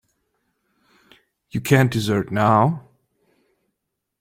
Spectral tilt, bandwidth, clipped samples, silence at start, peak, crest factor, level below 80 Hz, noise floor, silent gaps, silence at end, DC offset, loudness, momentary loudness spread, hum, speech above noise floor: -6.5 dB/octave; 16.5 kHz; under 0.1%; 1.55 s; -2 dBFS; 20 dB; -54 dBFS; -79 dBFS; none; 1.4 s; under 0.1%; -19 LUFS; 13 LU; none; 61 dB